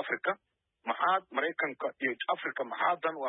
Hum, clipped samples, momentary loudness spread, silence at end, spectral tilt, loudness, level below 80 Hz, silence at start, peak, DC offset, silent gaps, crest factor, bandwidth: none; under 0.1%; 7 LU; 0 s; -7 dB/octave; -32 LUFS; under -90 dBFS; 0 s; -14 dBFS; under 0.1%; none; 18 dB; 4 kHz